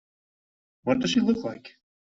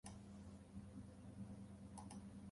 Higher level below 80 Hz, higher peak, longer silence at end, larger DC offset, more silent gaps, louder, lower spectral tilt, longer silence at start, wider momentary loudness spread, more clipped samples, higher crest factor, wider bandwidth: first, -62 dBFS vs -68 dBFS; first, -10 dBFS vs -38 dBFS; first, 0.4 s vs 0 s; neither; neither; first, -26 LUFS vs -57 LUFS; second, -4.5 dB/octave vs -6 dB/octave; first, 0.85 s vs 0.05 s; first, 13 LU vs 3 LU; neither; about the same, 20 dB vs 18 dB; second, 7.8 kHz vs 11.5 kHz